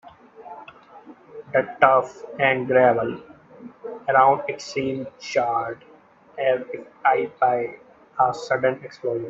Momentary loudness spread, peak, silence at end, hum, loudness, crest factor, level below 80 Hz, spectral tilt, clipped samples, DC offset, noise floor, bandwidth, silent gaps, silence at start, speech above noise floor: 22 LU; 0 dBFS; 0 s; none; -22 LUFS; 22 dB; -66 dBFS; -5.5 dB/octave; under 0.1%; under 0.1%; -46 dBFS; 7.8 kHz; none; 0.05 s; 25 dB